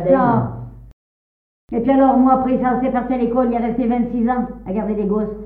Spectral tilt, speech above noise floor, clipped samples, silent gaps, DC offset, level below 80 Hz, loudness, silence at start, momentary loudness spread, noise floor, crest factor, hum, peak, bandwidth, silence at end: -11.5 dB/octave; over 73 dB; under 0.1%; 0.93-1.68 s; under 0.1%; -42 dBFS; -18 LUFS; 0 s; 10 LU; under -90 dBFS; 16 dB; none; -2 dBFS; 3.7 kHz; 0 s